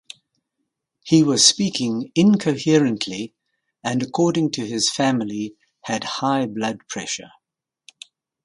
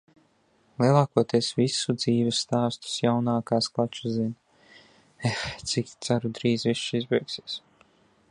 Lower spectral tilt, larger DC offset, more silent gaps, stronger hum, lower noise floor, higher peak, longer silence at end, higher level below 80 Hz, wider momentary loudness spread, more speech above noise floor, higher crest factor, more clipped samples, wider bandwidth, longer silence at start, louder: about the same, -4 dB/octave vs -5 dB/octave; neither; neither; neither; first, -83 dBFS vs -65 dBFS; first, 0 dBFS vs -6 dBFS; first, 1.15 s vs 0.7 s; about the same, -64 dBFS vs -62 dBFS; first, 15 LU vs 9 LU; first, 63 dB vs 39 dB; about the same, 22 dB vs 22 dB; neither; about the same, 11.5 kHz vs 11 kHz; first, 1.05 s vs 0.8 s; first, -20 LUFS vs -26 LUFS